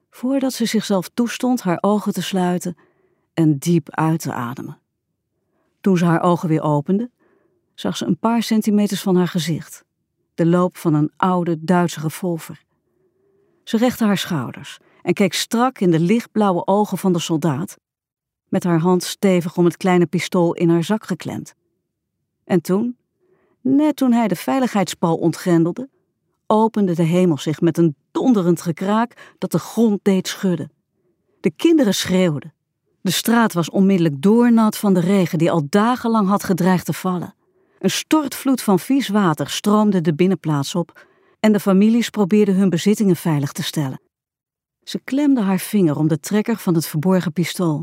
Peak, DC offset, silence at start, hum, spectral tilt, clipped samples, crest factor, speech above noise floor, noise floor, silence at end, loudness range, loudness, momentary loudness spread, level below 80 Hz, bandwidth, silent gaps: -2 dBFS; under 0.1%; 0.15 s; none; -6 dB/octave; under 0.1%; 18 dB; 58 dB; -75 dBFS; 0 s; 4 LU; -18 LUFS; 10 LU; -66 dBFS; 16 kHz; none